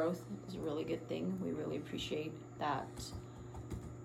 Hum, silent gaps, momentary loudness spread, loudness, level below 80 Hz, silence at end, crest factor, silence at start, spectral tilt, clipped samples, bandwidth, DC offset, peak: none; none; 8 LU; -42 LUFS; -60 dBFS; 0 s; 16 dB; 0 s; -6 dB/octave; under 0.1%; 16.5 kHz; under 0.1%; -24 dBFS